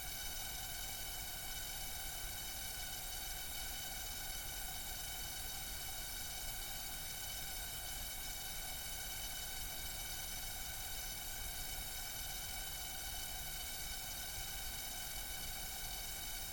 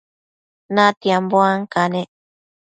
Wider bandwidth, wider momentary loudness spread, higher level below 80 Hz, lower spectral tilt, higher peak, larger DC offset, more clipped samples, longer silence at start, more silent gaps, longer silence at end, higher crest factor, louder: first, 17.5 kHz vs 9.2 kHz; second, 0 LU vs 9 LU; first, -52 dBFS vs -66 dBFS; second, -0.5 dB/octave vs -5.5 dB/octave; second, -30 dBFS vs 0 dBFS; neither; neither; second, 0 s vs 0.7 s; second, none vs 0.97-1.01 s; second, 0 s vs 0.55 s; second, 14 dB vs 20 dB; second, -43 LUFS vs -17 LUFS